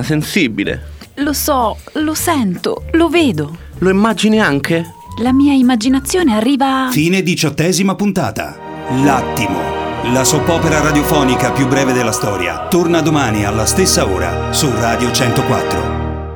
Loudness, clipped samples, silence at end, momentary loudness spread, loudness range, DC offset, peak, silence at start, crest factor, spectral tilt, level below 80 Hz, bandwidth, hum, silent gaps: -14 LUFS; under 0.1%; 0 s; 8 LU; 2 LU; under 0.1%; 0 dBFS; 0 s; 14 dB; -4.5 dB/octave; -32 dBFS; over 20 kHz; none; none